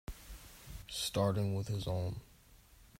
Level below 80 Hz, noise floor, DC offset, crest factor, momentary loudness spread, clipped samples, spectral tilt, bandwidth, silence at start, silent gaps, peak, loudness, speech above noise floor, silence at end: -54 dBFS; -62 dBFS; under 0.1%; 20 dB; 19 LU; under 0.1%; -5.5 dB/octave; 16 kHz; 0.1 s; none; -20 dBFS; -37 LUFS; 26 dB; 0.15 s